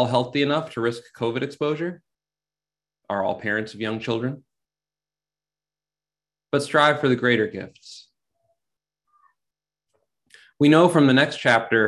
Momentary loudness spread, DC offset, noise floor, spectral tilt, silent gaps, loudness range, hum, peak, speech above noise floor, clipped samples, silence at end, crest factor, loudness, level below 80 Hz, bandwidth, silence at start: 13 LU; under 0.1%; under -90 dBFS; -6 dB/octave; none; 8 LU; 50 Hz at -60 dBFS; -4 dBFS; over 69 dB; under 0.1%; 0 s; 20 dB; -21 LUFS; -64 dBFS; 12 kHz; 0 s